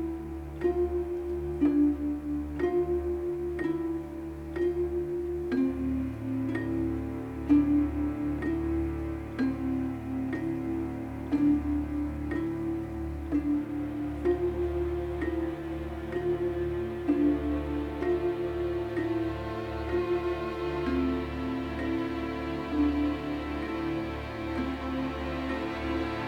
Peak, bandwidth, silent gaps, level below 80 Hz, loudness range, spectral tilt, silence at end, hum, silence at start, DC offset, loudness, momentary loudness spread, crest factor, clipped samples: -14 dBFS; 10 kHz; none; -42 dBFS; 2 LU; -8.5 dB/octave; 0 s; none; 0 s; under 0.1%; -31 LUFS; 7 LU; 16 dB; under 0.1%